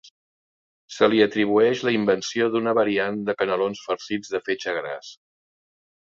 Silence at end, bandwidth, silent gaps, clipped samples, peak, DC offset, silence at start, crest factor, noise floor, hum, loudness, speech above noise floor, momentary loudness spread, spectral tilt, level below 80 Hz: 1 s; 7.6 kHz; none; under 0.1%; -2 dBFS; under 0.1%; 0.9 s; 22 dB; under -90 dBFS; none; -22 LUFS; over 68 dB; 10 LU; -5 dB/octave; -66 dBFS